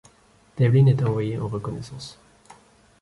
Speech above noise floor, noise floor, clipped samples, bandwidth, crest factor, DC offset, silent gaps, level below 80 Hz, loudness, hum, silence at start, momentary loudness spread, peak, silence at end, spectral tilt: 36 dB; -57 dBFS; under 0.1%; 11.5 kHz; 16 dB; under 0.1%; none; -54 dBFS; -22 LUFS; none; 0.55 s; 21 LU; -8 dBFS; 0.9 s; -8.5 dB/octave